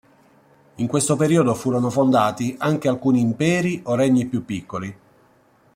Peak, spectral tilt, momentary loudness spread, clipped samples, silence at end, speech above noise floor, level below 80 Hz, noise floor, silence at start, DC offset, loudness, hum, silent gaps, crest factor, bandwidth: -4 dBFS; -6 dB/octave; 11 LU; under 0.1%; 0.85 s; 37 dB; -58 dBFS; -57 dBFS; 0.8 s; under 0.1%; -20 LUFS; none; none; 16 dB; 16 kHz